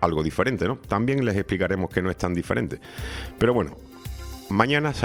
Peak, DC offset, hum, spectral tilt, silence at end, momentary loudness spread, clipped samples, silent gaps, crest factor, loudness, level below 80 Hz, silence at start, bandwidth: -2 dBFS; under 0.1%; none; -6.5 dB/octave; 0 s; 14 LU; under 0.1%; none; 22 dB; -25 LUFS; -42 dBFS; 0 s; 20 kHz